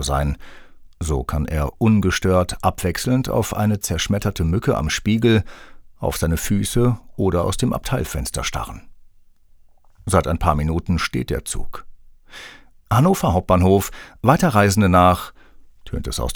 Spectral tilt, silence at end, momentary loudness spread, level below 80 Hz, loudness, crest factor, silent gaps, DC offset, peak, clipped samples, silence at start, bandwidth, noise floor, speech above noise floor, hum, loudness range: -5.5 dB/octave; 0 s; 15 LU; -32 dBFS; -20 LUFS; 20 dB; none; under 0.1%; 0 dBFS; under 0.1%; 0 s; over 20 kHz; -49 dBFS; 30 dB; none; 6 LU